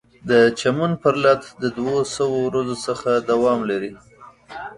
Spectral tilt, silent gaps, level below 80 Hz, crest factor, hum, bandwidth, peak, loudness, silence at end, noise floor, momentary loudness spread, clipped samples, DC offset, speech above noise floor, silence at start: -5.5 dB/octave; none; -56 dBFS; 18 dB; none; 11.5 kHz; -2 dBFS; -20 LUFS; 0.05 s; -39 dBFS; 11 LU; under 0.1%; under 0.1%; 20 dB; 0.25 s